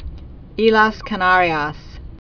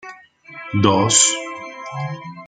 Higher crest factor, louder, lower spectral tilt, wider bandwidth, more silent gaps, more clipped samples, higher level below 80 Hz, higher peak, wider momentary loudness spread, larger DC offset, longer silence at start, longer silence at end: about the same, 18 dB vs 20 dB; about the same, -16 LUFS vs -16 LUFS; first, -6 dB/octave vs -3 dB/octave; second, 5.4 kHz vs 9.8 kHz; neither; neither; first, -36 dBFS vs -58 dBFS; about the same, 0 dBFS vs 0 dBFS; about the same, 20 LU vs 18 LU; neither; about the same, 0 s vs 0.05 s; about the same, 0.1 s vs 0 s